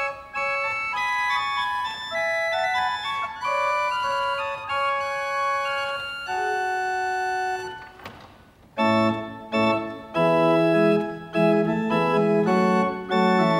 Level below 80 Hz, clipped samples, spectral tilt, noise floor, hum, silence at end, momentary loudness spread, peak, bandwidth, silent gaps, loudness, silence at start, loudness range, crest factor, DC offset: -60 dBFS; under 0.1%; -5.5 dB/octave; -51 dBFS; none; 0 s; 8 LU; -6 dBFS; 16 kHz; none; -23 LUFS; 0 s; 5 LU; 18 dB; under 0.1%